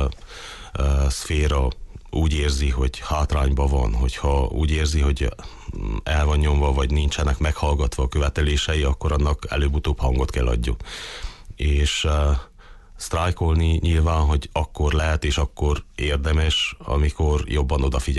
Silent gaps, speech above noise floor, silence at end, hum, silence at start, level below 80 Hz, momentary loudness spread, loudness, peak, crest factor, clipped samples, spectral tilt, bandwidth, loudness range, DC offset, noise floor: none; 23 dB; 0 s; none; 0 s; -22 dBFS; 9 LU; -22 LUFS; -10 dBFS; 10 dB; under 0.1%; -5.5 dB/octave; 12 kHz; 2 LU; under 0.1%; -44 dBFS